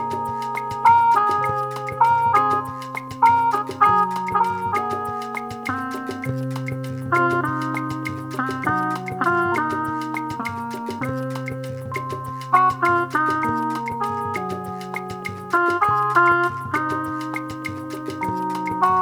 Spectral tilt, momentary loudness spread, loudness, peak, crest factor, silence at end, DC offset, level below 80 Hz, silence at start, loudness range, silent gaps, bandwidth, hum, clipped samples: -6 dB/octave; 12 LU; -22 LUFS; -2 dBFS; 20 dB; 0 s; under 0.1%; -56 dBFS; 0 s; 5 LU; none; over 20 kHz; none; under 0.1%